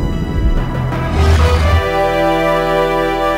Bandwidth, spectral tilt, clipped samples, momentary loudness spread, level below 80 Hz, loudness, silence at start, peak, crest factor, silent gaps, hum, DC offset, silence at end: 16 kHz; -6.5 dB/octave; under 0.1%; 6 LU; -18 dBFS; -14 LUFS; 0 s; -2 dBFS; 10 dB; none; none; under 0.1%; 0 s